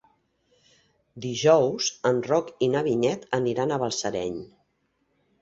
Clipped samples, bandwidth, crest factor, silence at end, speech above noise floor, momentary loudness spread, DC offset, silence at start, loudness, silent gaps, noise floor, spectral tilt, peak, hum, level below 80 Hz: under 0.1%; 8 kHz; 22 dB; 0.95 s; 48 dB; 12 LU; under 0.1%; 1.15 s; -25 LUFS; none; -72 dBFS; -4.5 dB/octave; -6 dBFS; none; -64 dBFS